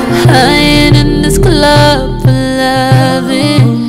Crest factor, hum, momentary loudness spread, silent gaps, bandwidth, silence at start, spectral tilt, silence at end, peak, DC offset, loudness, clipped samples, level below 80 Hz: 8 dB; none; 5 LU; none; 15.5 kHz; 0 s; -5.5 dB/octave; 0 s; 0 dBFS; under 0.1%; -7 LUFS; 2%; -20 dBFS